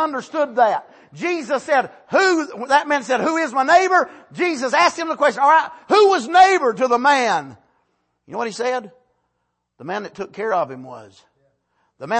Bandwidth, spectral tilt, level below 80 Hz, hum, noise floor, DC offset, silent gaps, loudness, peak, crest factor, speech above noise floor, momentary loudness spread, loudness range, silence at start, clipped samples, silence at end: 8.8 kHz; -3 dB/octave; -66 dBFS; none; -73 dBFS; under 0.1%; none; -18 LUFS; -2 dBFS; 16 dB; 55 dB; 14 LU; 12 LU; 0 s; under 0.1%; 0 s